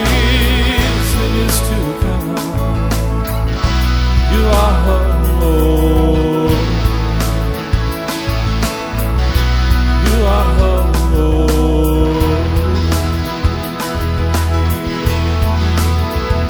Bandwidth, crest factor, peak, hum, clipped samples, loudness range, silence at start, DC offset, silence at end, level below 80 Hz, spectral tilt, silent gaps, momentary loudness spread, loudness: over 20 kHz; 12 dB; 0 dBFS; none; under 0.1%; 3 LU; 0 s; under 0.1%; 0 s; -16 dBFS; -5.5 dB/octave; none; 5 LU; -15 LUFS